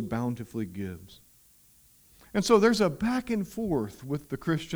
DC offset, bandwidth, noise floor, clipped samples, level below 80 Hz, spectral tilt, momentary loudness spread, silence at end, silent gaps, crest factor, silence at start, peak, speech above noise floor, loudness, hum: under 0.1%; over 20 kHz; -60 dBFS; under 0.1%; -54 dBFS; -5.5 dB/octave; 14 LU; 0 s; none; 22 dB; 0 s; -8 dBFS; 32 dB; -28 LUFS; none